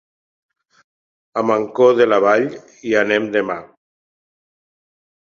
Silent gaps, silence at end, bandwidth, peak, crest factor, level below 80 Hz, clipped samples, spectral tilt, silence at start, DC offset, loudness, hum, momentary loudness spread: none; 1.55 s; 7.2 kHz; -2 dBFS; 18 dB; -64 dBFS; under 0.1%; -5.5 dB/octave; 1.35 s; under 0.1%; -17 LUFS; none; 13 LU